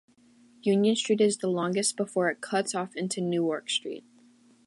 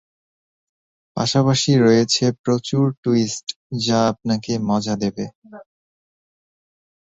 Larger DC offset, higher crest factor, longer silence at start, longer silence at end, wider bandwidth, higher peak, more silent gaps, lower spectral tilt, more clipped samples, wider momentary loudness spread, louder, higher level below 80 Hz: neither; about the same, 16 dB vs 18 dB; second, 0.65 s vs 1.15 s; second, 0.65 s vs 1.5 s; first, 11.5 kHz vs 8.2 kHz; second, -12 dBFS vs -4 dBFS; second, none vs 2.39-2.44 s, 2.97-3.03 s, 3.43-3.47 s, 3.56-3.70 s, 5.35-5.42 s; second, -4 dB/octave vs -5.5 dB/octave; neither; second, 8 LU vs 12 LU; second, -27 LUFS vs -19 LUFS; second, -80 dBFS vs -56 dBFS